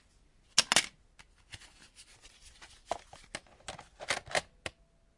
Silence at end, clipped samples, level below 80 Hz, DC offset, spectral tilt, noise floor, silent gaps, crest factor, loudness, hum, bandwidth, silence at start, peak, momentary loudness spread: 0.5 s; under 0.1%; -64 dBFS; under 0.1%; 0 dB/octave; -65 dBFS; none; 34 dB; -32 LUFS; none; 11.5 kHz; 0.55 s; -6 dBFS; 27 LU